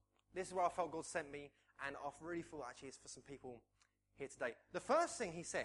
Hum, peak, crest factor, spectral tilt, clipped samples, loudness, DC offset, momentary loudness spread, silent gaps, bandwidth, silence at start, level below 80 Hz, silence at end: none; -24 dBFS; 22 dB; -3.5 dB/octave; under 0.1%; -44 LUFS; under 0.1%; 17 LU; none; 11.5 kHz; 0.35 s; -76 dBFS; 0 s